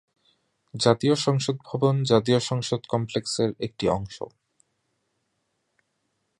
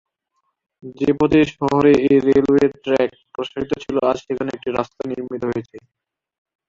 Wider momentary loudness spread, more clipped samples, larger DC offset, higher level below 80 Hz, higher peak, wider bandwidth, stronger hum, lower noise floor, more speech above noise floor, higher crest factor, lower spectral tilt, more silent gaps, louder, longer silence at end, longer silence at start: about the same, 10 LU vs 12 LU; neither; neither; second, -56 dBFS vs -50 dBFS; about the same, -2 dBFS vs -2 dBFS; first, 11.5 kHz vs 7.6 kHz; neither; about the same, -75 dBFS vs -72 dBFS; about the same, 51 dB vs 54 dB; first, 24 dB vs 18 dB; second, -5.5 dB/octave vs -7 dB/octave; neither; second, -24 LUFS vs -19 LUFS; first, 2.1 s vs 0.9 s; about the same, 0.75 s vs 0.85 s